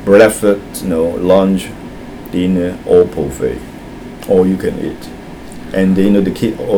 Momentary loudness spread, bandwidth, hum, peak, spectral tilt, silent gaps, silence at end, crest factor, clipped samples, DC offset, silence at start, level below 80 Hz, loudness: 19 LU; 18.5 kHz; none; 0 dBFS; -6.5 dB/octave; none; 0 s; 14 dB; 0.3%; under 0.1%; 0 s; -36 dBFS; -13 LUFS